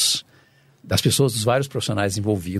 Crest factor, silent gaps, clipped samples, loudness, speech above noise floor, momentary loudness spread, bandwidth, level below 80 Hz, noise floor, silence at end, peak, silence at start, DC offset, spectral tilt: 16 dB; none; under 0.1%; -21 LUFS; 35 dB; 5 LU; 15 kHz; -52 dBFS; -55 dBFS; 0 s; -6 dBFS; 0 s; under 0.1%; -4 dB/octave